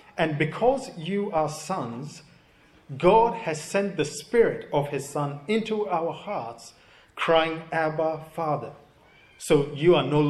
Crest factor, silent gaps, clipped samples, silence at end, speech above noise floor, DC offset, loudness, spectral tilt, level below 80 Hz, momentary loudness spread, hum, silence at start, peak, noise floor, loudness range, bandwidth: 22 dB; none; under 0.1%; 0 s; 32 dB; under 0.1%; -25 LUFS; -5.5 dB/octave; -54 dBFS; 13 LU; none; 0.15 s; -4 dBFS; -57 dBFS; 3 LU; 13 kHz